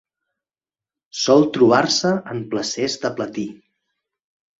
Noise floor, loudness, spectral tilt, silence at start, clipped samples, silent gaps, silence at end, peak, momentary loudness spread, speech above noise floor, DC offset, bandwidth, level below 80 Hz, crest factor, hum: under -90 dBFS; -19 LUFS; -4 dB/octave; 1.15 s; under 0.1%; none; 1.05 s; -2 dBFS; 14 LU; over 72 dB; under 0.1%; 8 kHz; -62 dBFS; 20 dB; none